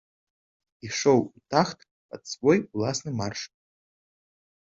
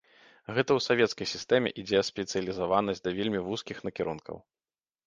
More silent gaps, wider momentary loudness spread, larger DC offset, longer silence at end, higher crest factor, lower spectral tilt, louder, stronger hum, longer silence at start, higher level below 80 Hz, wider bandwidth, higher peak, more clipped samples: first, 1.91-2.09 s vs none; first, 21 LU vs 11 LU; neither; first, 1.2 s vs 0.65 s; about the same, 22 dB vs 22 dB; about the same, -5 dB/octave vs -4.5 dB/octave; first, -26 LUFS vs -29 LUFS; neither; first, 0.85 s vs 0.5 s; about the same, -62 dBFS vs -62 dBFS; second, 7.8 kHz vs 9.6 kHz; about the same, -6 dBFS vs -8 dBFS; neither